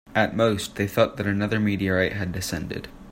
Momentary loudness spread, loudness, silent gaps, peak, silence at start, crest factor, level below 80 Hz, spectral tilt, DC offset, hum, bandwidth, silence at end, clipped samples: 8 LU; -24 LUFS; none; -6 dBFS; 0.05 s; 20 dB; -48 dBFS; -5.5 dB/octave; under 0.1%; none; 16.5 kHz; 0 s; under 0.1%